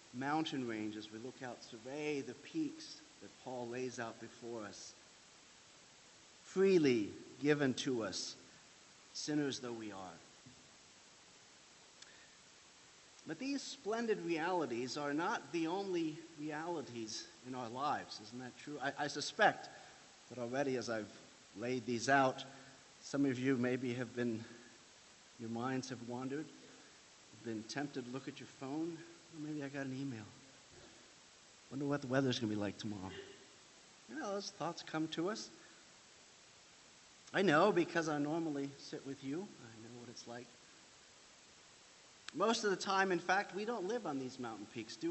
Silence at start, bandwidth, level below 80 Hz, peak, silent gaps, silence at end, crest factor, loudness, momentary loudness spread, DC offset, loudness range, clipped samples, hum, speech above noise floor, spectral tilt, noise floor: 0 s; 8.2 kHz; -82 dBFS; -16 dBFS; none; 0 s; 24 dB; -39 LUFS; 25 LU; under 0.1%; 10 LU; under 0.1%; none; 23 dB; -4.5 dB/octave; -62 dBFS